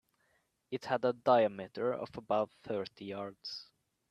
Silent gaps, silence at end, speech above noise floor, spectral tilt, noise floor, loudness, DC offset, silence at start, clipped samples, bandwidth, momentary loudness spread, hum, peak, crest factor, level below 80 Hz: none; 0.45 s; 42 dB; -6 dB/octave; -76 dBFS; -35 LUFS; under 0.1%; 0.7 s; under 0.1%; 11 kHz; 15 LU; none; -14 dBFS; 22 dB; -76 dBFS